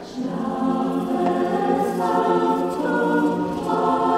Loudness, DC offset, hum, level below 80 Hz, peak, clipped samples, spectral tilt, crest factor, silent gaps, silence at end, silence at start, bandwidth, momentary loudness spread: -22 LUFS; under 0.1%; none; -56 dBFS; -6 dBFS; under 0.1%; -7 dB/octave; 14 dB; none; 0 s; 0 s; 15 kHz; 5 LU